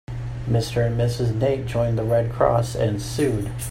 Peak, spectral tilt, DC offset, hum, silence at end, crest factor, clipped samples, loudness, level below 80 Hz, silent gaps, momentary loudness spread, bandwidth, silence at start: -6 dBFS; -6.5 dB/octave; under 0.1%; none; 0 s; 16 dB; under 0.1%; -23 LUFS; -38 dBFS; none; 4 LU; 16 kHz; 0.1 s